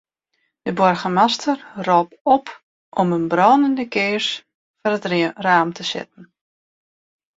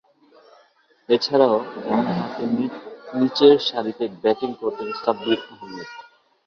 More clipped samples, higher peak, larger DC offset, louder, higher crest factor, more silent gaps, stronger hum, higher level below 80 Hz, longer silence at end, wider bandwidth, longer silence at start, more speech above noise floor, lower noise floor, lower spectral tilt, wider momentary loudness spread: neither; about the same, -2 dBFS vs -2 dBFS; neither; about the same, -19 LUFS vs -21 LUFS; about the same, 18 dB vs 20 dB; first, 2.21-2.25 s, 2.63-2.92 s, 4.55-4.74 s vs none; neither; about the same, -64 dBFS vs -66 dBFS; first, 1.15 s vs 0.45 s; first, 7.8 kHz vs 6.6 kHz; second, 0.65 s vs 1.1 s; first, 53 dB vs 37 dB; first, -71 dBFS vs -58 dBFS; about the same, -5 dB/octave vs -6 dB/octave; second, 12 LU vs 20 LU